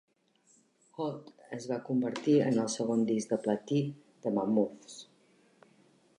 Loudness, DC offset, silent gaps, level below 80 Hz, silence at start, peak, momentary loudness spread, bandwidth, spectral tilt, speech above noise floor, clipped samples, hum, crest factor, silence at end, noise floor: -31 LUFS; under 0.1%; none; -80 dBFS; 1 s; -14 dBFS; 19 LU; 11 kHz; -6 dB/octave; 38 dB; under 0.1%; none; 18 dB; 1.15 s; -68 dBFS